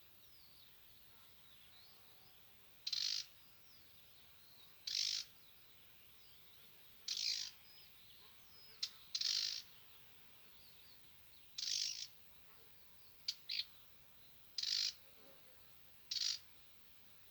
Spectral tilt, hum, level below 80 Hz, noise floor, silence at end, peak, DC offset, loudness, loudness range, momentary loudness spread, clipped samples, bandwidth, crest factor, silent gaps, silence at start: 2 dB/octave; none; -84 dBFS; -63 dBFS; 0 s; -24 dBFS; under 0.1%; -41 LUFS; 4 LU; 21 LU; under 0.1%; over 20 kHz; 24 dB; none; 0 s